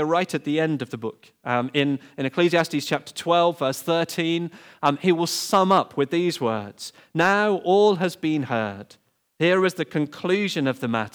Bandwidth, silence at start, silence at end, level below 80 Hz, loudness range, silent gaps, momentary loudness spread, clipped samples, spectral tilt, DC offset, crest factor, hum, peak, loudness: over 20 kHz; 0 s; 0.05 s; -74 dBFS; 2 LU; none; 10 LU; under 0.1%; -5 dB/octave; under 0.1%; 16 dB; none; -6 dBFS; -23 LUFS